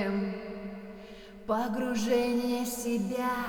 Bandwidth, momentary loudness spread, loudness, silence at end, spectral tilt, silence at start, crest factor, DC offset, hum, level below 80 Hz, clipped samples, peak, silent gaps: over 20 kHz; 17 LU; -31 LUFS; 0 s; -5 dB/octave; 0 s; 16 dB; under 0.1%; none; -56 dBFS; under 0.1%; -16 dBFS; none